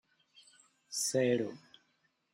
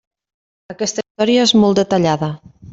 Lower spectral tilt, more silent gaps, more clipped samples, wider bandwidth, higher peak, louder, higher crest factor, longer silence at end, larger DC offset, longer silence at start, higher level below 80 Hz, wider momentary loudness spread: about the same, -3.5 dB/octave vs -4.5 dB/octave; second, none vs 1.10-1.15 s; neither; first, 16 kHz vs 7.8 kHz; second, -18 dBFS vs -2 dBFS; second, -33 LUFS vs -15 LUFS; first, 20 dB vs 14 dB; first, 0.75 s vs 0.05 s; neither; first, 0.9 s vs 0.7 s; second, -82 dBFS vs -54 dBFS; about the same, 13 LU vs 12 LU